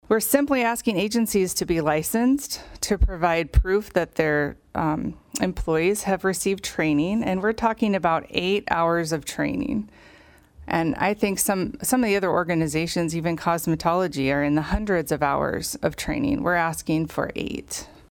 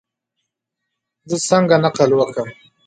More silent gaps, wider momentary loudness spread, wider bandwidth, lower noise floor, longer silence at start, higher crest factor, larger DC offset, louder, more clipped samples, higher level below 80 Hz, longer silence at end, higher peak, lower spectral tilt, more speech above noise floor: neither; second, 6 LU vs 13 LU; first, 19.5 kHz vs 9.4 kHz; second, -52 dBFS vs -79 dBFS; second, 0.1 s vs 1.25 s; about the same, 20 dB vs 18 dB; neither; second, -24 LUFS vs -16 LUFS; neither; first, -36 dBFS vs -62 dBFS; second, 0.2 s vs 0.35 s; second, -4 dBFS vs 0 dBFS; about the same, -4.5 dB/octave vs -5 dB/octave; second, 29 dB vs 63 dB